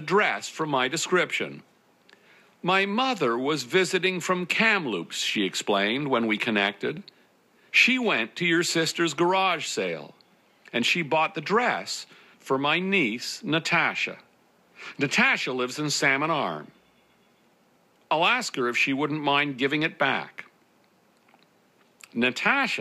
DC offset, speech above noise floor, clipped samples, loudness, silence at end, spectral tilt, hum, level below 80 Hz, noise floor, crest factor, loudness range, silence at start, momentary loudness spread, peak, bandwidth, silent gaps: under 0.1%; 38 dB; under 0.1%; -24 LUFS; 0 s; -3.5 dB/octave; none; -80 dBFS; -63 dBFS; 22 dB; 3 LU; 0 s; 10 LU; -6 dBFS; 15.5 kHz; none